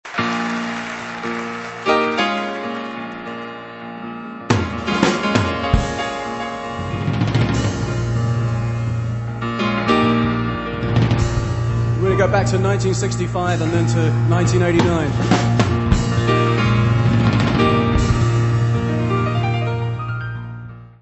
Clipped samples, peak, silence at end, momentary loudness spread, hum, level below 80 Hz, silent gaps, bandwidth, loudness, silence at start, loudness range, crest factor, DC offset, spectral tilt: under 0.1%; 0 dBFS; 0.1 s; 11 LU; none; -32 dBFS; none; 8.4 kHz; -19 LUFS; 0.05 s; 6 LU; 18 dB; under 0.1%; -6.5 dB/octave